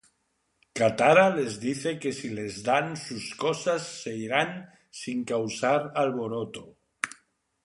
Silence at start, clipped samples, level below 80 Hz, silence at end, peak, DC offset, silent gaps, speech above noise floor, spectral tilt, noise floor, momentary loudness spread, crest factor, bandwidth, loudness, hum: 0.75 s; under 0.1%; -68 dBFS; 0.5 s; -6 dBFS; under 0.1%; none; 48 dB; -4.5 dB/octave; -74 dBFS; 15 LU; 22 dB; 11.5 kHz; -27 LUFS; none